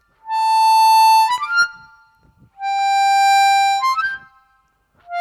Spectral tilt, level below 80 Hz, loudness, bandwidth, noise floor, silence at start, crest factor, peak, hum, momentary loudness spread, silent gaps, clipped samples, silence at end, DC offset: 2.5 dB/octave; -66 dBFS; -15 LUFS; 17 kHz; -61 dBFS; 0.25 s; 10 dB; -6 dBFS; none; 13 LU; none; under 0.1%; 0 s; under 0.1%